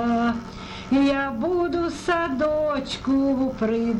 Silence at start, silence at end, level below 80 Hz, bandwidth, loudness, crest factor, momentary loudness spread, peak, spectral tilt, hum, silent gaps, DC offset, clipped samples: 0 s; 0 s; -46 dBFS; 10.5 kHz; -23 LUFS; 12 dB; 5 LU; -12 dBFS; -6 dB/octave; none; none; under 0.1%; under 0.1%